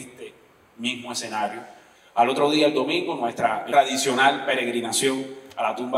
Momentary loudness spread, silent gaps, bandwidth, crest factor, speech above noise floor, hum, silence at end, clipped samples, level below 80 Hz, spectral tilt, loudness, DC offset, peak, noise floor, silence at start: 11 LU; none; 16 kHz; 18 dB; 31 dB; none; 0 s; under 0.1%; -74 dBFS; -2.5 dB/octave; -23 LUFS; under 0.1%; -6 dBFS; -53 dBFS; 0 s